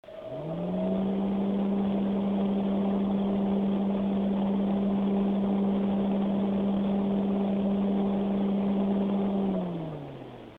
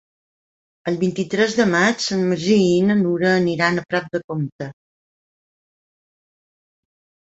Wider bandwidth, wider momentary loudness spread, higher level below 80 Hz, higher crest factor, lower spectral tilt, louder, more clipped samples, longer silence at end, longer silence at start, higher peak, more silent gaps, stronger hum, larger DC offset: second, 4 kHz vs 8.2 kHz; second, 5 LU vs 11 LU; first, -54 dBFS vs -60 dBFS; second, 10 dB vs 18 dB; first, -10.5 dB/octave vs -5.5 dB/octave; second, -28 LUFS vs -19 LUFS; neither; second, 0 s vs 2.6 s; second, 0.05 s vs 0.85 s; second, -16 dBFS vs -4 dBFS; second, none vs 4.24-4.28 s, 4.52-4.59 s; neither; neither